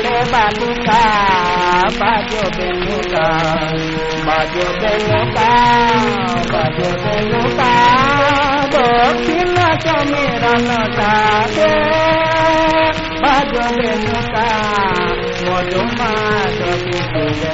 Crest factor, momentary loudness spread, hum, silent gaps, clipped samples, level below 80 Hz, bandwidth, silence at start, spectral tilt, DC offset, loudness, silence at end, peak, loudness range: 14 dB; 6 LU; none; none; under 0.1%; -32 dBFS; 8 kHz; 0 s; -3 dB/octave; under 0.1%; -14 LUFS; 0 s; 0 dBFS; 3 LU